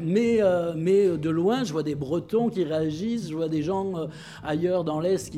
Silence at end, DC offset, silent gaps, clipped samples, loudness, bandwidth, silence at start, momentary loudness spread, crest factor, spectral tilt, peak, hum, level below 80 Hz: 0 s; under 0.1%; none; under 0.1%; -25 LUFS; 13.5 kHz; 0 s; 8 LU; 14 dB; -7 dB/octave; -10 dBFS; none; -56 dBFS